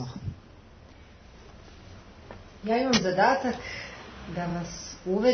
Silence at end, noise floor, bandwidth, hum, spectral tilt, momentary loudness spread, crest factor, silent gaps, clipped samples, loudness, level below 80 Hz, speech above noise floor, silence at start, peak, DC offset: 0 s; -51 dBFS; 6.6 kHz; none; -4.5 dB/octave; 26 LU; 20 dB; none; under 0.1%; -28 LUFS; -52 dBFS; 25 dB; 0 s; -10 dBFS; under 0.1%